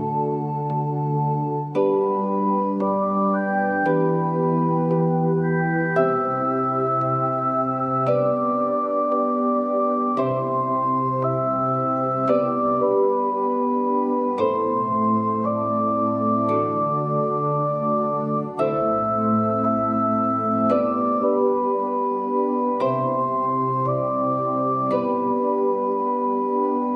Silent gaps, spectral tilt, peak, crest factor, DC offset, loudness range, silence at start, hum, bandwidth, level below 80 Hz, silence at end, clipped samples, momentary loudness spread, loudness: none; -10.5 dB/octave; -8 dBFS; 14 dB; under 0.1%; 1 LU; 0 s; none; 5.8 kHz; -62 dBFS; 0 s; under 0.1%; 2 LU; -22 LUFS